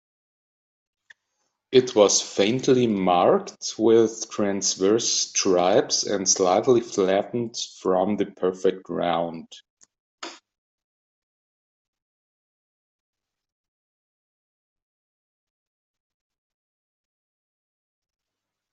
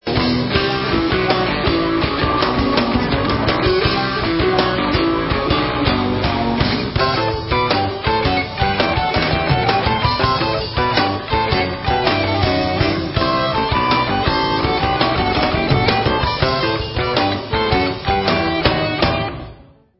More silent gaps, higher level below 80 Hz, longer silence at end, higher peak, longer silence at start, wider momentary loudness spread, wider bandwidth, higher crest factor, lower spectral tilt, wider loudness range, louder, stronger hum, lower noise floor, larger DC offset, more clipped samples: first, 9.70-9.77 s, 10.00-10.18 s vs none; second, -70 dBFS vs -30 dBFS; first, 8.35 s vs 0.35 s; second, -4 dBFS vs 0 dBFS; first, 1.7 s vs 0.05 s; first, 10 LU vs 3 LU; first, 8.2 kHz vs 5.8 kHz; first, 22 dB vs 16 dB; second, -3.5 dB/octave vs -9.5 dB/octave; first, 9 LU vs 1 LU; second, -22 LUFS vs -17 LUFS; neither; first, -86 dBFS vs -42 dBFS; neither; neither